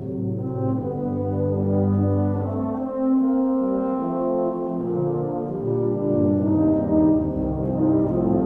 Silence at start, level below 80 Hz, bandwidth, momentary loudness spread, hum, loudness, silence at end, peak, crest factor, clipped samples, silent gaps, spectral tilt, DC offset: 0 s; -44 dBFS; 2.8 kHz; 6 LU; none; -22 LUFS; 0 s; -8 dBFS; 14 dB; under 0.1%; none; -13 dB/octave; under 0.1%